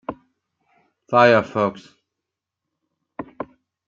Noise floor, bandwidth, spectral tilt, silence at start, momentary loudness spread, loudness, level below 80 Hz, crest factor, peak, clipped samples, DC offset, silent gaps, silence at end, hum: -84 dBFS; 7.4 kHz; -6.5 dB/octave; 0.1 s; 23 LU; -18 LUFS; -64 dBFS; 22 dB; -2 dBFS; under 0.1%; under 0.1%; none; 0.45 s; none